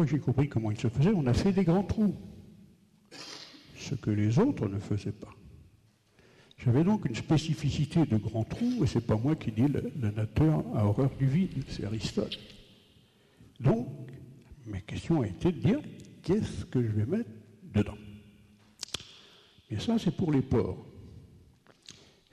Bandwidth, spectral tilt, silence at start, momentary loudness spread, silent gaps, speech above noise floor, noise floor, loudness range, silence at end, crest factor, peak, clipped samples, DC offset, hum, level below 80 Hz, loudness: 12.5 kHz; -7.5 dB/octave; 0 s; 19 LU; none; 36 dB; -64 dBFS; 6 LU; 1.05 s; 14 dB; -18 dBFS; under 0.1%; under 0.1%; none; -50 dBFS; -30 LUFS